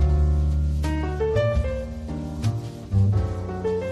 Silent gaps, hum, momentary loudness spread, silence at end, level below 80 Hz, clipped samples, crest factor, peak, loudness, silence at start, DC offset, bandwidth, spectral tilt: none; none; 10 LU; 0 s; -26 dBFS; under 0.1%; 12 dB; -10 dBFS; -25 LUFS; 0 s; under 0.1%; 8.8 kHz; -8 dB/octave